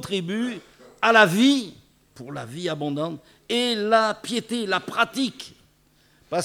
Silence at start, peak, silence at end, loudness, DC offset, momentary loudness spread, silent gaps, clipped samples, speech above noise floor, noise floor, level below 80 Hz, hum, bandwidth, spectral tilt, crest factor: 0 s; -2 dBFS; 0 s; -22 LUFS; under 0.1%; 22 LU; none; under 0.1%; 37 dB; -60 dBFS; -66 dBFS; none; 16.5 kHz; -4 dB/octave; 22 dB